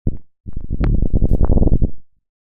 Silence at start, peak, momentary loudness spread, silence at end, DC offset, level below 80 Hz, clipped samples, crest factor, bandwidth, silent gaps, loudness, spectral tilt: 0.05 s; -4 dBFS; 18 LU; 0.35 s; under 0.1%; -18 dBFS; under 0.1%; 10 dB; 2.7 kHz; 0.40-0.44 s; -20 LUFS; -12 dB/octave